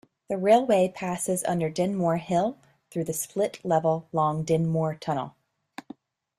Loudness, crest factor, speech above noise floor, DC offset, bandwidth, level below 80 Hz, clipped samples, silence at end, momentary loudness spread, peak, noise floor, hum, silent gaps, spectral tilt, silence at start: -26 LUFS; 18 dB; 24 dB; under 0.1%; 14.5 kHz; -64 dBFS; under 0.1%; 1.1 s; 14 LU; -8 dBFS; -49 dBFS; none; none; -6 dB/octave; 0.3 s